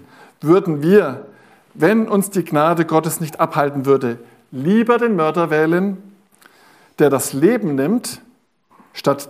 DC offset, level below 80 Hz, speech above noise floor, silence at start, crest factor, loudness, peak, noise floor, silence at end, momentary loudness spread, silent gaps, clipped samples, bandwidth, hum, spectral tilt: under 0.1%; -66 dBFS; 39 dB; 0.4 s; 16 dB; -17 LUFS; -2 dBFS; -55 dBFS; 0.05 s; 11 LU; none; under 0.1%; 15.5 kHz; none; -6 dB/octave